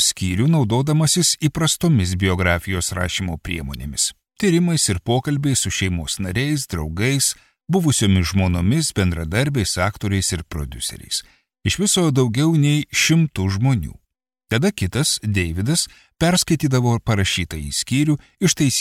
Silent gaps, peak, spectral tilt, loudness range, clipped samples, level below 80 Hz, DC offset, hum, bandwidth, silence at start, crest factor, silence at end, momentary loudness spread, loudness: none; -4 dBFS; -4.5 dB/octave; 2 LU; under 0.1%; -38 dBFS; under 0.1%; none; 16 kHz; 0 s; 16 dB; 0 s; 8 LU; -19 LUFS